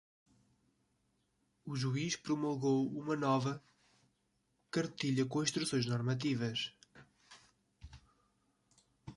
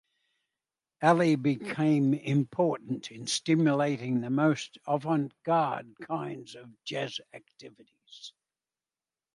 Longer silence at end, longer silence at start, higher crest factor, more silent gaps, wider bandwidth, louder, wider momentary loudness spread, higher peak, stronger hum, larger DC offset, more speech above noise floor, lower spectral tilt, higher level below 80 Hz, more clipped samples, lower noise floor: second, 0.05 s vs 1.05 s; first, 1.65 s vs 1 s; about the same, 20 dB vs 20 dB; neither; about the same, 11.5 kHz vs 11.5 kHz; second, -36 LUFS vs -29 LUFS; second, 8 LU vs 18 LU; second, -18 dBFS vs -10 dBFS; first, 50 Hz at -70 dBFS vs none; neither; second, 44 dB vs over 61 dB; about the same, -5 dB/octave vs -6 dB/octave; first, -70 dBFS vs -76 dBFS; neither; second, -79 dBFS vs under -90 dBFS